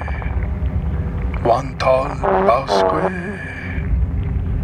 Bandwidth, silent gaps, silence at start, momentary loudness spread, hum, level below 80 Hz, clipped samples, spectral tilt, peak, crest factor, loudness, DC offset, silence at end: 10 kHz; none; 0 s; 9 LU; none; -24 dBFS; under 0.1%; -7 dB/octave; -2 dBFS; 16 dB; -19 LUFS; under 0.1%; 0 s